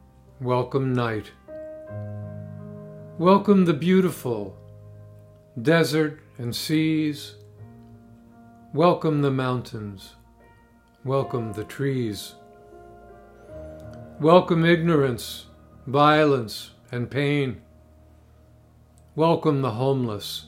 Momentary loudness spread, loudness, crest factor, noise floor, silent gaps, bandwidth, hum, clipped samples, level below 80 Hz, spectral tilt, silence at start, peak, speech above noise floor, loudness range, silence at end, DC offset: 22 LU; -23 LUFS; 24 dB; -56 dBFS; none; 16 kHz; none; under 0.1%; -58 dBFS; -6.5 dB/octave; 0.4 s; -2 dBFS; 34 dB; 9 LU; 0 s; under 0.1%